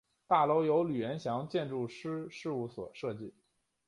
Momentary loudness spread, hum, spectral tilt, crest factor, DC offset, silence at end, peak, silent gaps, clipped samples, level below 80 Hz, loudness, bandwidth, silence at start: 13 LU; none; -7 dB/octave; 20 dB; under 0.1%; 0.6 s; -14 dBFS; none; under 0.1%; -74 dBFS; -34 LUFS; 11 kHz; 0.3 s